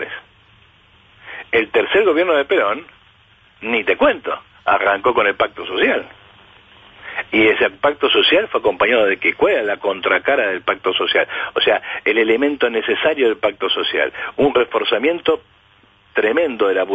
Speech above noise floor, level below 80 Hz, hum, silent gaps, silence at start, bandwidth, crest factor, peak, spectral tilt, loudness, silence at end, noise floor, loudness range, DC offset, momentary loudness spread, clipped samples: 36 dB; -54 dBFS; none; none; 0 s; 8 kHz; 14 dB; -4 dBFS; -5.5 dB/octave; -17 LUFS; 0 s; -52 dBFS; 3 LU; under 0.1%; 8 LU; under 0.1%